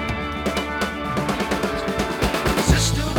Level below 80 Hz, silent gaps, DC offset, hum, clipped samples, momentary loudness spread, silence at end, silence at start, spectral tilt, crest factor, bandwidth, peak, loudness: -30 dBFS; none; under 0.1%; none; under 0.1%; 6 LU; 0 s; 0 s; -4.5 dB/octave; 20 dB; 20 kHz; -2 dBFS; -22 LUFS